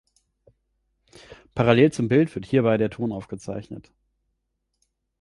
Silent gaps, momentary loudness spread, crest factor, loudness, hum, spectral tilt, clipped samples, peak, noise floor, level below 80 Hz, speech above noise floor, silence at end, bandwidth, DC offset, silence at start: none; 18 LU; 22 dB; -22 LUFS; none; -7.5 dB/octave; under 0.1%; -4 dBFS; -77 dBFS; -56 dBFS; 55 dB; 1.4 s; 11.5 kHz; under 0.1%; 1.3 s